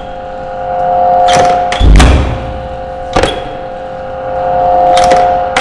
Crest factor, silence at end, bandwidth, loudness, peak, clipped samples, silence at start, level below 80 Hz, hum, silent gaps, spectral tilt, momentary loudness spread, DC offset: 10 dB; 0 s; 11.5 kHz; -10 LUFS; 0 dBFS; 0.2%; 0 s; -16 dBFS; none; none; -5 dB/octave; 15 LU; under 0.1%